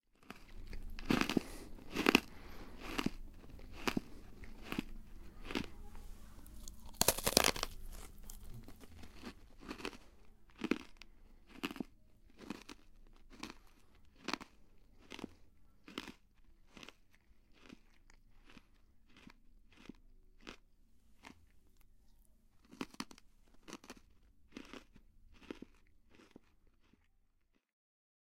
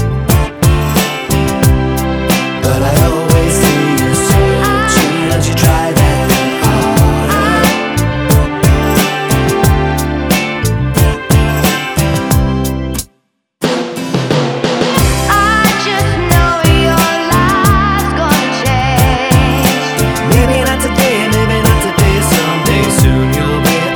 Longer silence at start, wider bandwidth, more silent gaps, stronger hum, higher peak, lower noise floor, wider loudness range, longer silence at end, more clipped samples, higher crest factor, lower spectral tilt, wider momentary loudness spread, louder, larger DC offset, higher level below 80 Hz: first, 0.2 s vs 0 s; second, 16.5 kHz vs over 20 kHz; neither; neither; about the same, -2 dBFS vs 0 dBFS; first, -75 dBFS vs -60 dBFS; first, 24 LU vs 3 LU; first, 1.95 s vs 0 s; neither; first, 42 dB vs 10 dB; second, -3 dB/octave vs -5 dB/octave; first, 26 LU vs 4 LU; second, -39 LUFS vs -11 LUFS; neither; second, -56 dBFS vs -20 dBFS